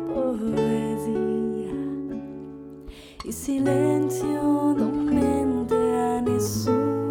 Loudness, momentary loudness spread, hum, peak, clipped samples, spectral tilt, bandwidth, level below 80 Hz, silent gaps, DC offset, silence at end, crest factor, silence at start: -24 LUFS; 16 LU; none; -10 dBFS; under 0.1%; -6.5 dB/octave; 18 kHz; -48 dBFS; none; under 0.1%; 0 s; 14 dB; 0 s